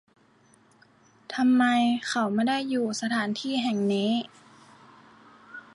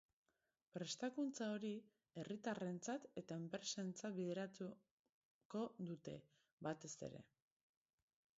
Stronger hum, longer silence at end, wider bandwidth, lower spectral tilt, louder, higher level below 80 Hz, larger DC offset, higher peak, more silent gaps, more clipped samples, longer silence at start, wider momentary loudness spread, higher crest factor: neither; second, 0.15 s vs 1.15 s; first, 11.5 kHz vs 7.6 kHz; about the same, -4.5 dB/octave vs -5 dB/octave; first, -26 LUFS vs -49 LUFS; first, -76 dBFS vs -88 dBFS; neither; first, -14 dBFS vs -32 dBFS; second, none vs 4.91-5.50 s, 6.52-6.58 s; neither; first, 1.3 s vs 0.75 s; first, 13 LU vs 10 LU; about the same, 14 dB vs 18 dB